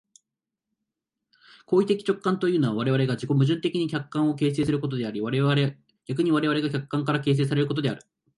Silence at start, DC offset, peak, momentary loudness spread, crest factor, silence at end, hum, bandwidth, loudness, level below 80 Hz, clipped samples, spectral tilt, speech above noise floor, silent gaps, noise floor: 1.7 s; under 0.1%; -10 dBFS; 6 LU; 16 dB; 0.4 s; none; 11.5 kHz; -25 LUFS; -62 dBFS; under 0.1%; -7.5 dB/octave; 63 dB; none; -87 dBFS